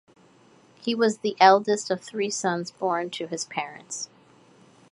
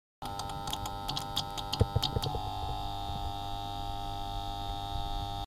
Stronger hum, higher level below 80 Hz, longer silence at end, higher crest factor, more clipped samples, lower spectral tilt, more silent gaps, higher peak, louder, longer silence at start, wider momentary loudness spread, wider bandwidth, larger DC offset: neither; second, -78 dBFS vs -42 dBFS; first, 0.85 s vs 0 s; about the same, 24 dB vs 22 dB; neither; about the same, -3.5 dB/octave vs -4.5 dB/octave; neither; first, -2 dBFS vs -12 dBFS; first, -25 LUFS vs -36 LUFS; first, 0.85 s vs 0.2 s; first, 16 LU vs 7 LU; second, 11.5 kHz vs 16 kHz; neither